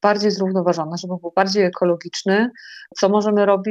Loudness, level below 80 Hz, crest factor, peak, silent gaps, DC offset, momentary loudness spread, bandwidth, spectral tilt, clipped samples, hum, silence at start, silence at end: -19 LUFS; -68 dBFS; 16 dB; -2 dBFS; none; under 0.1%; 9 LU; 8 kHz; -5.5 dB/octave; under 0.1%; none; 0.05 s; 0 s